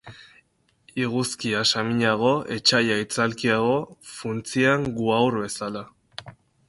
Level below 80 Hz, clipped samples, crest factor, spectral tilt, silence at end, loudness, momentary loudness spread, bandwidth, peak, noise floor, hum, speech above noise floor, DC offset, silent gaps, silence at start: -60 dBFS; under 0.1%; 22 dB; -4 dB/octave; 0.35 s; -23 LUFS; 15 LU; 12 kHz; -4 dBFS; -63 dBFS; none; 40 dB; under 0.1%; none; 0.05 s